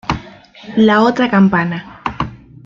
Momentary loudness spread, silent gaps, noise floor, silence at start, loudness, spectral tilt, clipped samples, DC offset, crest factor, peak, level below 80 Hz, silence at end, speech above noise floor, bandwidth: 14 LU; none; -37 dBFS; 0.05 s; -14 LUFS; -7 dB/octave; under 0.1%; under 0.1%; 14 dB; -2 dBFS; -40 dBFS; 0.3 s; 25 dB; 7.4 kHz